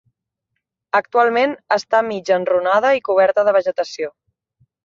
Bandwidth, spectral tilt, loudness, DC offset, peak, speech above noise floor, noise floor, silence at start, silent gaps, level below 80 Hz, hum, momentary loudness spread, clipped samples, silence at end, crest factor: 7.4 kHz; -4 dB/octave; -17 LUFS; under 0.1%; -2 dBFS; 61 dB; -77 dBFS; 0.95 s; none; -68 dBFS; none; 8 LU; under 0.1%; 0.75 s; 16 dB